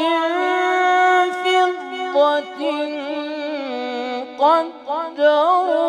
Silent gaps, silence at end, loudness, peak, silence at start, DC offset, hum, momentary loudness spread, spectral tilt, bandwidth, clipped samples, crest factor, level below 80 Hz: none; 0 s; -19 LUFS; -4 dBFS; 0 s; under 0.1%; none; 11 LU; -2 dB/octave; 11 kHz; under 0.1%; 14 dB; -76 dBFS